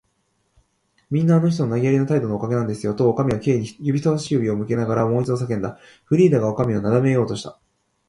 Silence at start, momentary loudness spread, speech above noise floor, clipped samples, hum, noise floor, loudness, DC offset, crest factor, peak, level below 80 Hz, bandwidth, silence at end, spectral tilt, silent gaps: 1.1 s; 8 LU; 49 dB; under 0.1%; none; -68 dBFS; -20 LUFS; under 0.1%; 16 dB; -4 dBFS; -54 dBFS; 11.5 kHz; 0.55 s; -8 dB/octave; none